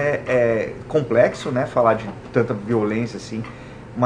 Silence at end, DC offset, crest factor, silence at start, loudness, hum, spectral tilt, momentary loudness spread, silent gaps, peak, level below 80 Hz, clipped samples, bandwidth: 0 s; under 0.1%; 18 dB; 0 s; -21 LUFS; none; -7 dB/octave; 13 LU; none; -4 dBFS; -50 dBFS; under 0.1%; 10 kHz